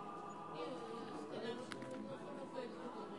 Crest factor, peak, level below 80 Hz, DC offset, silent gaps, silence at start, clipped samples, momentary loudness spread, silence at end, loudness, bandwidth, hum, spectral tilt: 20 dB; -28 dBFS; -84 dBFS; under 0.1%; none; 0 s; under 0.1%; 3 LU; 0 s; -48 LUFS; 11.5 kHz; none; -5.5 dB/octave